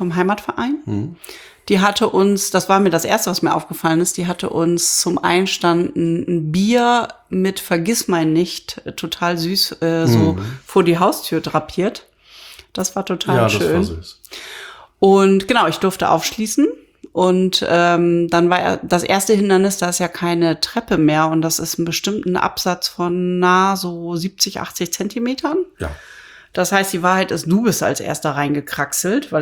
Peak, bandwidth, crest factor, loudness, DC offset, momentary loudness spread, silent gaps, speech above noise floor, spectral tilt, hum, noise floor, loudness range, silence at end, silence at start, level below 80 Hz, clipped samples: 0 dBFS; over 20 kHz; 16 dB; -17 LUFS; under 0.1%; 10 LU; none; 25 dB; -4.5 dB/octave; none; -42 dBFS; 4 LU; 0 s; 0 s; -50 dBFS; under 0.1%